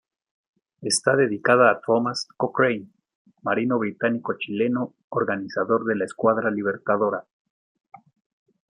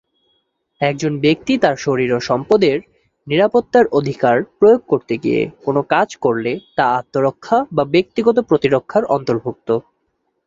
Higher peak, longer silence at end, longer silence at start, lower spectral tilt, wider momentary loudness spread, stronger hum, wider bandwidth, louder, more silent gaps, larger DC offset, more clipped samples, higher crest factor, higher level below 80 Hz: about the same, -4 dBFS vs -2 dBFS; first, 1.5 s vs 0.65 s; about the same, 0.8 s vs 0.8 s; second, -4.5 dB/octave vs -6.5 dB/octave; first, 10 LU vs 7 LU; neither; first, 11.5 kHz vs 7.6 kHz; second, -23 LUFS vs -17 LUFS; first, 3.15-3.25 s, 5.04-5.11 s vs none; neither; neither; about the same, 20 dB vs 16 dB; second, -72 dBFS vs -54 dBFS